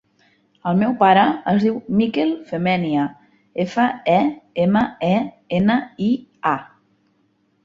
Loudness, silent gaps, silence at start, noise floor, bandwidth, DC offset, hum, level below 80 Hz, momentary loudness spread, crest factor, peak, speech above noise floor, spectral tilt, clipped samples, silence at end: -19 LUFS; none; 0.65 s; -63 dBFS; 7.4 kHz; under 0.1%; none; -56 dBFS; 8 LU; 18 dB; -2 dBFS; 45 dB; -8 dB/octave; under 0.1%; 1 s